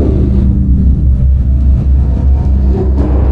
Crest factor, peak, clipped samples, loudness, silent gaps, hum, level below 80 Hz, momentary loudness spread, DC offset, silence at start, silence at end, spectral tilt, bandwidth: 8 dB; 0 dBFS; under 0.1%; -11 LUFS; none; none; -10 dBFS; 1 LU; under 0.1%; 0 s; 0 s; -11.5 dB/octave; 2 kHz